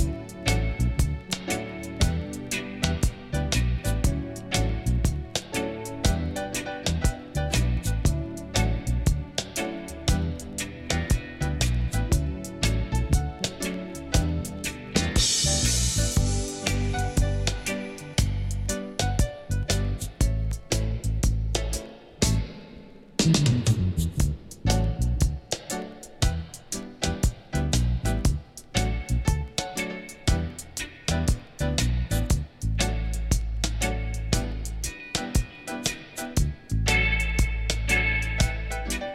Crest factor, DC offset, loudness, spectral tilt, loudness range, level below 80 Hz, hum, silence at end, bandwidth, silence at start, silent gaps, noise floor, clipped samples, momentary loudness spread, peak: 20 dB; under 0.1%; -27 LUFS; -4 dB/octave; 4 LU; -30 dBFS; none; 0 s; 16 kHz; 0 s; none; -46 dBFS; under 0.1%; 9 LU; -6 dBFS